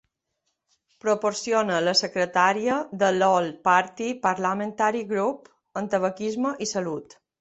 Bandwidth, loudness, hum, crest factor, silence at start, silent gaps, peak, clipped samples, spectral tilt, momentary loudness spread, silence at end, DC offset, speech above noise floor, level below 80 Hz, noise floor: 8.4 kHz; -24 LUFS; none; 20 dB; 1.05 s; none; -6 dBFS; under 0.1%; -3.5 dB/octave; 9 LU; 0.35 s; under 0.1%; 54 dB; -68 dBFS; -78 dBFS